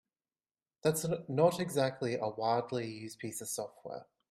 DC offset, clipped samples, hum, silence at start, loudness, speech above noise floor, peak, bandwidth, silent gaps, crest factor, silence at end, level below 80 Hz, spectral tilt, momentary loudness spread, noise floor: under 0.1%; under 0.1%; none; 0.85 s; -34 LUFS; over 56 dB; -14 dBFS; 15.5 kHz; none; 20 dB; 0.3 s; -74 dBFS; -5 dB/octave; 14 LU; under -90 dBFS